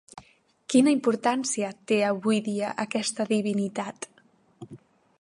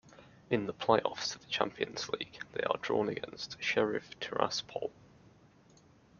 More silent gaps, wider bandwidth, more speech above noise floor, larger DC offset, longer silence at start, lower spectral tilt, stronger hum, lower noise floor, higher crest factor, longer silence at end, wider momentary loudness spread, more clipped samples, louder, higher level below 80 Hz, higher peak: neither; first, 11.5 kHz vs 7.2 kHz; first, 34 dB vs 28 dB; neither; about the same, 0.15 s vs 0.05 s; about the same, -4.5 dB/octave vs -4 dB/octave; neither; about the same, -59 dBFS vs -62 dBFS; second, 18 dB vs 24 dB; second, 0.45 s vs 1.3 s; first, 20 LU vs 10 LU; neither; first, -26 LUFS vs -34 LUFS; second, -76 dBFS vs -70 dBFS; about the same, -8 dBFS vs -10 dBFS